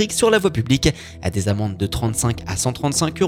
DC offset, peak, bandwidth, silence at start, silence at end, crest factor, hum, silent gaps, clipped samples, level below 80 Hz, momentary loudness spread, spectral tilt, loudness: under 0.1%; -2 dBFS; 17 kHz; 0 s; 0 s; 16 dB; none; none; under 0.1%; -36 dBFS; 7 LU; -4.5 dB/octave; -20 LUFS